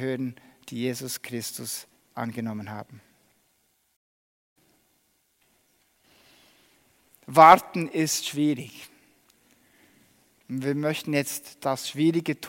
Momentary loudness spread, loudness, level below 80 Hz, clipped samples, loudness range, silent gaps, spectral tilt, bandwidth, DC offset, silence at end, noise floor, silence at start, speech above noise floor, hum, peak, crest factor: 22 LU; -24 LUFS; -70 dBFS; under 0.1%; 16 LU; 3.96-4.56 s; -4.5 dB/octave; 16.5 kHz; under 0.1%; 0 s; -69 dBFS; 0 s; 45 dB; none; -2 dBFS; 26 dB